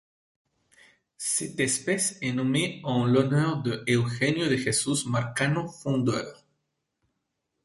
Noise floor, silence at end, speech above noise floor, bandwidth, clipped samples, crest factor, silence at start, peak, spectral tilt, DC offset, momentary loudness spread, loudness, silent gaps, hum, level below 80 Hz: -80 dBFS; 1.3 s; 54 dB; 12 kHz; under 0.1%; 18 dB; 1.2 s; -8 dBFS; -4.5 dB/octave; under 0.1%; 6 LU; -26 LUFS; none; none; -62 dBFS